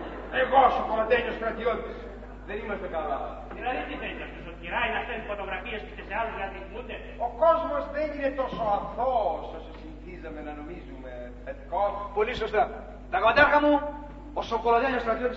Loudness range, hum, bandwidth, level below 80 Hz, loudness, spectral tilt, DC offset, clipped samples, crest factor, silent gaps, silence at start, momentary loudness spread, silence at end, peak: 8 LU; 50 Hz at -45 dBFS; 7.6 kHz; -44 dBFS; -27 LUFS; -6.5 dB/octave; under 0.1%; under 0.1%; 22 dB; none; 0 s; 18 LU; 0 s; -6 dBFS